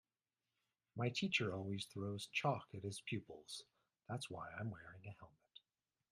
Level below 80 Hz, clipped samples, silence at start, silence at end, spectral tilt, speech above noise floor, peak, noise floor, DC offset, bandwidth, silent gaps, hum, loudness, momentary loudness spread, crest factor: -80 dBFS; under 0.1%; 0.95 s; 0.55 s; -5 dB/octave; over 45 dB; -24 dBFS; under -90 dBFS; under 0.1%; 13.5 kHz; none; none; -44 LUFS; 18 LU; 22 dB